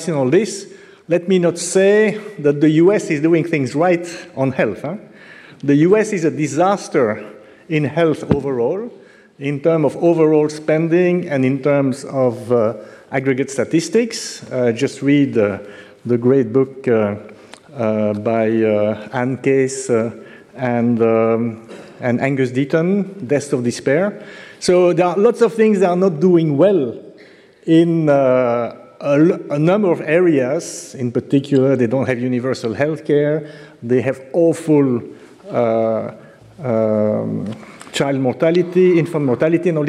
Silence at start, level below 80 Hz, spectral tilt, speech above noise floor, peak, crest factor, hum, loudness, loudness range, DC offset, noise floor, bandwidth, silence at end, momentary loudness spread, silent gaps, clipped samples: 0 s; -58 dBFS; -6.5 dB/octave; 29 dB; 0 dBFS; 16 dB; none; -17 LUFS; 4 LU; under 0.1%; -45 dBFS; 12.5 kHz; 0 s; 11 LU; none; under 0.1%